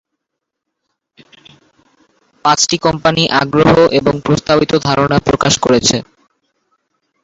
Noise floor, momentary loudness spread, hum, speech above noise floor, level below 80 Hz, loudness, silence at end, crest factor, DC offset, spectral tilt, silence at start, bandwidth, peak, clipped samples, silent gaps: -77 dBFS; 5 LU; none; 66 dB; -40 dBFS; -12 LUFS; 1.2 s; 14 dB; under 0.1%; -4 dB/octave; 2.45 s; 8 kHz; 0 dBFS; under 0.1%; none